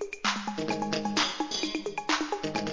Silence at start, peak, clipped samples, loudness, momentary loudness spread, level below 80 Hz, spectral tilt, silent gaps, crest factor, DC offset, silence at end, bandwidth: 0 s; -14 dBFS; under 0.1%; -30 LUFS; 4 LU; -62 dBFS; -3 dB/octave; none; 16 dB; 0.2%; 0 s; 7.8 kHz